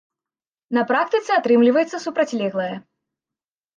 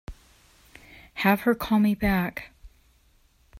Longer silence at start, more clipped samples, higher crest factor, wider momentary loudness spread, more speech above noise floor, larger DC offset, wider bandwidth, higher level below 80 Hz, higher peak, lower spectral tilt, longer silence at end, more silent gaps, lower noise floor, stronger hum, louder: first, 0.7 s vs 0.1 s; neither; second, 16 dB vs 22 dB; second, 11 LU vs 21 LU; first, over 71 dB vs 38 dB; neither; second, 7.4 kHz vs 16 kHz; second, -76 dBFS vs -46 dBFS; about the same, -6 dBFS vs -6 dBFS; about the same, -5.5 dB/octave vs -6.5 dB/octave; about the same, 1 s vs 0.95 s; neither; first, under -90 dBFS vs -61 dBFS; neither; first, -20 LUFS vs -24 LUFS